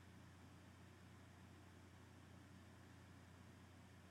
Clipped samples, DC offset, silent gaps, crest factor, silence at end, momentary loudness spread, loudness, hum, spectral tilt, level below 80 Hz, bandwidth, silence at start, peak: under 0.1%; under 0.1%; none; 12 dB; 0 s; 1 LU; -64 LUFS; none; -5.5 dB/octave; -80 dBFS; 14.5 kHz; 0 s; -50 dBFS